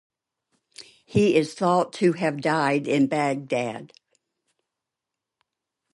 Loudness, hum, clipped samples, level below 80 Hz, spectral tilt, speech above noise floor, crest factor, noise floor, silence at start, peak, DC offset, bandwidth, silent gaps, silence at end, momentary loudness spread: -23 LUFS; none; under 0.1%; -62 dBFS; -6 dB/octave; 64 dB; 18 dB; -86 dBFS; 0.8 s; -8 dBFS; under 0.1%; 11.5 kHz; none; 2.05 s; 7 LU